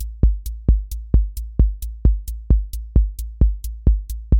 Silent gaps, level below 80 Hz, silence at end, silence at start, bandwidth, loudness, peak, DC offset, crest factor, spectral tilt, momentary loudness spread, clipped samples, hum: none; -18 dBFS; 0 s; 0 s; 16.5 kHz; -22 LUFS; -2 dBFS; under 0.1%; 16 dB; -8.5 dB/octave; 3 LU; under 0.1%; none